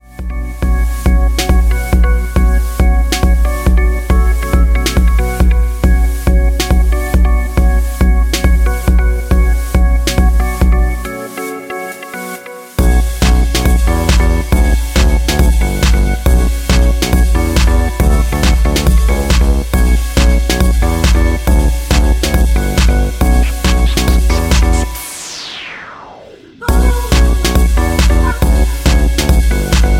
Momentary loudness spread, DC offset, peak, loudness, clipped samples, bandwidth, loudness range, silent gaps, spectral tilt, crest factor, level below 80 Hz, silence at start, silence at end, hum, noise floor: 10 LU; under 0.1%; 0 dBFS; -13 LUFS; under 0.1%; 16 kHz; 3 LU; none; -5.5 dB/octave; 10 dB; -12 dBFS; 0.15 s; 0 s; none; -36 dBFS